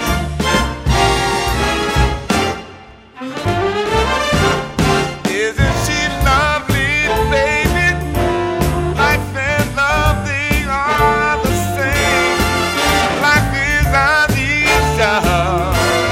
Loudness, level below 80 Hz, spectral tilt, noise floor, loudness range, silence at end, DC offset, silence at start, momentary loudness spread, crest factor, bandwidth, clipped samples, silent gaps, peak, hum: -15 LUFS; -24 dBFS; -4.5 dB/octave; -38 dBFS; 4 LU; 0 s; under 0.1%; 0 s; 5 LU; 14 dB; 16.5 kHz; under 0.1%; none; 0 dBFS; none